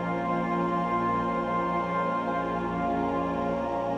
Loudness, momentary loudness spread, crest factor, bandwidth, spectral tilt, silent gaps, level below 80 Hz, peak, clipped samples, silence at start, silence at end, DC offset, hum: -28 LUFS; 2 LU; 14 dB; 8.2 kHz; -8 dB/octave; none; -50 dBFS; -14 dBFS; under 0.1%; 0 s; 0 s; under 0.1%; none